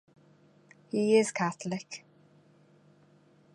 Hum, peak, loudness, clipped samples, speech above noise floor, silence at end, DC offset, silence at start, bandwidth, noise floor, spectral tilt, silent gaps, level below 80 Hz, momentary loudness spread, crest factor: 50 Hz at -60 dBFS; -12 dBFS; -29 LUFS; under 0.1%; 34 dB; 1.55 s; under 0.1%; 0.95 s; 11.5 kHz; -62 dBFS; -5 dB/octave; none; -82 dBFS; 18 LU; 22 dB